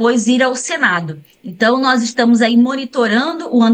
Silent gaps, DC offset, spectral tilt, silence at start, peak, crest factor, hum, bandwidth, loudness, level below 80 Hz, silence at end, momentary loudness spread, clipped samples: none; under 0.1%; -4 dB/octave; 0 s; -2 dBFS; 12 dB; none; 9.8 kHz; -14 LUFS; -68 dBFS; 0 s; 7 LU; under 0.1%